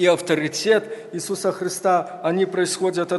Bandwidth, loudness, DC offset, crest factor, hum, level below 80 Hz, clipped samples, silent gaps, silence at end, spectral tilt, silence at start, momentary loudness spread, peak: 12 kHz; -22 LUFS; under 0.1%; 16 dB; none; -72 dBFS; under 0.1%; none; 0 s; -4 dB/octave; 0 s; 6 LU; -4 dBFS